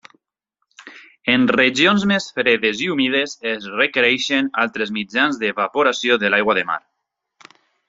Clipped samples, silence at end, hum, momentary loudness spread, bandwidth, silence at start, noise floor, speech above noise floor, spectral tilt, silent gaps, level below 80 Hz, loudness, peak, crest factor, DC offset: under 0.1%; 1.1 s; none; 9 LU; 7.8 kHz; 0.8 s; -76 dBFS; 58 dB; -4 dB/octave; none; -62 dBFS; -18 LUFS; -2 dBFS; 18 dB; under 0.1%